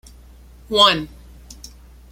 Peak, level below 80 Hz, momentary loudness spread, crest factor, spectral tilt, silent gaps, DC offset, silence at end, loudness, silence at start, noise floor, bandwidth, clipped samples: -2 dBFS; -44 dBFS; 26 LU; 22 dB; -3 dB/octave; none; under 0.1%; 0.45 s; -15 LUFS; 0.7 s; -44 dBFS; 16.5 kHz; under 0.1%